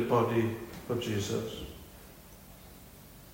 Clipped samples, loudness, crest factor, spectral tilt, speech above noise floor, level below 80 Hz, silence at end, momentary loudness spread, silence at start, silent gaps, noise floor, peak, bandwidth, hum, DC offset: under 0.1%; -33 LUFS; 20 dB; -6 dB/octave; 21 dB; -56 dBFS; 0 s; 23 LU; 0 s; none; -52 dBFS; -14 dBFS; 16.5 kHz; none; under 0.1%